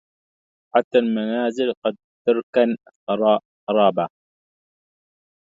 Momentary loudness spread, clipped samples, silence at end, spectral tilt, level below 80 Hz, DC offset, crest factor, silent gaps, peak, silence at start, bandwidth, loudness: 8 LU; under 0.1%; 1.4 s; -6.5 dB/octave; -72 dBFS; under 0.1%; 22 dB; 0.84-0.91 s, 1.77-1.82 s, 2.04-2.25 s, 2.43-2.53 s, 2.95-3.07 s, 3.45-3.67 s; -2 dBFS; 0.75 s; 7.8 kHz; -21 LUFS